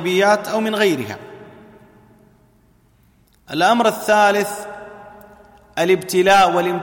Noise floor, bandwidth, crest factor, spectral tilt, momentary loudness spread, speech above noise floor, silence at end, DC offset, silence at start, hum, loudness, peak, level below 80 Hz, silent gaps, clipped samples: -55 dBFS; 17 kHz; 16 dB; -4 dB/octave; 20 LU; 39 dB; 0 s; under 0.1%; 0 s; none; -16 LUFS; -2 dBFS; -58 dBFS; none; under 0.1%